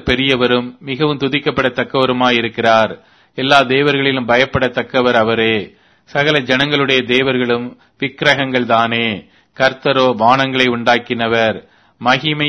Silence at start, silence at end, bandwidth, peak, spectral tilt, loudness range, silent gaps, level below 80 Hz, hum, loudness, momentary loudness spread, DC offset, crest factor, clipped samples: 0.05 s; 0 s; 11 kHz; 0 dBFS; -5.5 dB/octave; 1 LU; none; -44 dBFS; none; -14 LUFS; 8 LU; under 0.1%; 14 dB; under 0.1%